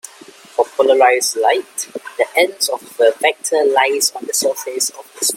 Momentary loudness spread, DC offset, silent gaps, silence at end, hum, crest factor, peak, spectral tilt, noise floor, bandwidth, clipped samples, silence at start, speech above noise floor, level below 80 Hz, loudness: 10 LU; under 0.1%; none; 0 s; none; 16 dB; 0 dBFS; 0.5 dB/octave; -41 dBFS; 16.5 kHz; under 0.1%; 0.6 s; 25 dB; -68 dBFS; -16 LUFS